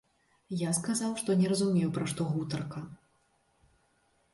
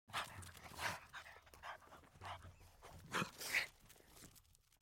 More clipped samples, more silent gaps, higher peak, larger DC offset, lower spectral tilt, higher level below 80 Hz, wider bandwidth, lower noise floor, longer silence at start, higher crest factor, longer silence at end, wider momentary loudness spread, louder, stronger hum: neither; neither; first, -16 dBFS vs -24 dBFS; neither; first, -5.5 dB/octave vs -2.5 dB/octave; about the same, -68 dBFS vs -70 dBFS; second, 12 kHz vs 16.5 kHz; about the same, -71 dBFS vs -69 dBFS; first, 0.5 s vs 0.1 s; second, 16 dB vs 24 dB; first, 1.4 s vs 0.25 s; second, 13 LU vs 22 LU; first, -31 LUFS vs -46 LUFS; neither